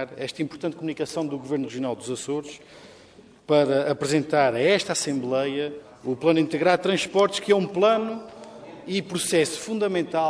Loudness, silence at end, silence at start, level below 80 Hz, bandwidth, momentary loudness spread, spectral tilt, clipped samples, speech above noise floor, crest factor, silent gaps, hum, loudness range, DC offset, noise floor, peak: -24 LUFS; 0 s; 0 s; -66 dBFS; 11 kHz; 11 LU; -4.5 dB/octave; under 0.1%; 27 dB; 20 dB; none; none; 5 LU; under 0.1%; -51 dBFS; -6 dBFS